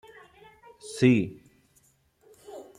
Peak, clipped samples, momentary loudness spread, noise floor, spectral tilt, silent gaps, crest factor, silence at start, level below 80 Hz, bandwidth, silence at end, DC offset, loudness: -8 dBFS; under 0.1%; 24 LU; -65 dBFS; -6.5 dB/octave; none; 22 dB; 0.85 s; -68 dBFS; 12 kHz; 0.15 s; under 0.1%; -24 LUFS